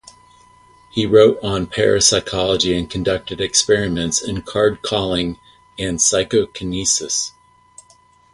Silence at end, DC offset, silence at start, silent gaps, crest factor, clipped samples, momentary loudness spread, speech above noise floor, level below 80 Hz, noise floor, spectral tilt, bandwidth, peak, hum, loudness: 1.05 s; under 0.1%; 0.95 s; none; 18 dB; under 0.1%; 11 LU; 35 dB; -42 dBFS; -52 dBFS; -3 dB/octave; 11.5 kHz; 0 dBFS; none; -17 LUFS